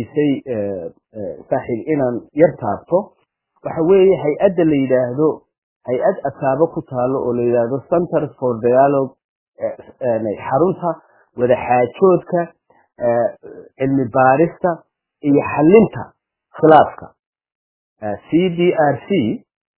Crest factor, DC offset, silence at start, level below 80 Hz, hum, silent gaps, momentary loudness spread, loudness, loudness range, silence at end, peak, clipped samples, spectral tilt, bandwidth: 18 dB; under 0.1%; 0 s; -52 dBFS; none; 5.58-5.81 s, 9.24-9.52 s, 17.19-17.33 s, 17.55-17.96 s; 15 LU; -17 LUFS; 3 LU; 0.4 s; 0 dBFS; under 0.1%; -11.5 dB/octave; 4 kHz